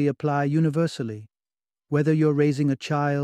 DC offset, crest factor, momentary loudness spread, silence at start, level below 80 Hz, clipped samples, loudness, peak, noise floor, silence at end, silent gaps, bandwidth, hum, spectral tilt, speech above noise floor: under 0.1%; 14 dB; 10 LU; 0 s; -66 dBFS; under 0.1%; -23 LUFS; -10 dBFS; under -90 dBFS; 0 s; none; 10 kHz; none; -8 dB/octave; over 68 dB